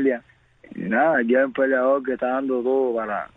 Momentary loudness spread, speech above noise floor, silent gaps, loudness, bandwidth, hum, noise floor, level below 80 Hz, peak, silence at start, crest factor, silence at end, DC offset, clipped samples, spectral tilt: 9 LU; 32 dB; none; -21 LUFS; 3.9 kHz; none; -53 dBFS; -64 dBFS; -8 dBFS; 0 s; 14 dB; 0.1 s; under 0.1%; under 0.1%; -8.5 dB/octave